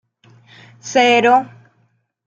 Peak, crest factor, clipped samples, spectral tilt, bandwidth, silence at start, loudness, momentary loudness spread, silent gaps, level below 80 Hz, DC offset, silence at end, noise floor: -2 dBFS; 16 dB; under 0.1%; -3 dB/octave; 7.8 kHz; 0.85 s; -14 LUFS; 23 LU; none; -70 dBFS; under 0.1%; 0.8 s; -62 dBFS